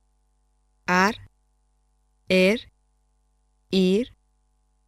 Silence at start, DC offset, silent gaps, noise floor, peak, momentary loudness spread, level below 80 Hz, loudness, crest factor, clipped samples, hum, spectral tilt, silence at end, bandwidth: 0.9 s; under 0.1%; none; -67 dBFS; -8 dBFS; 16 LU; -56 dBFS; -22 LUFS; 20 dB; under 0.1%; 50 Hz at -55 dBFS; -5.5 dB/octave; 0.85 s; 14.5 kHz